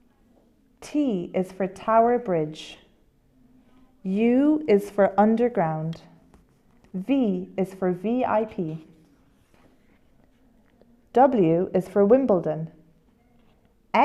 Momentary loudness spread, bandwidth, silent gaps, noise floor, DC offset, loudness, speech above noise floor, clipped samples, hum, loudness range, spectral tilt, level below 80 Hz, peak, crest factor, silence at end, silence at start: 15 LU; 13 kHz; none; -61 dBFS; under 0.1%; -23 LUFS; 38 dB; under 0.1%; none; 5 LU; -8 dB/octave; -60 dBFS; -6 dBFS; 20 dB; 0 s; 0.8 s